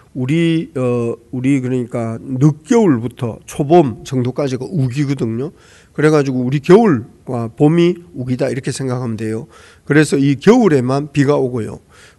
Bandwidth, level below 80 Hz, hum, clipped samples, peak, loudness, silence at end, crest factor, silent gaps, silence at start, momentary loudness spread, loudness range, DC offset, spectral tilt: 12 kHz; -50 dBFS; none; 0.2%; 0 dBFS; -15 LUFS; 0.4 s; 16 dB; none; 0.15 s; 13 LU; 2 LU; under 0.1%; -7 dB/octave